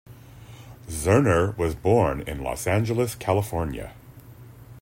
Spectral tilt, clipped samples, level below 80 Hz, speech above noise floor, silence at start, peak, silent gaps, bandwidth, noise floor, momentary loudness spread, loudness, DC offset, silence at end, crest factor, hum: -6.5 dB/octave; under 0.1%; -44 dBFS; 22 dB; 0.1 s; -6 dBFS; none; 16.5 kHz; -45 dBFS; 19 LU; -24 LUFS; under 0.1%; 0 s; 18 dB; none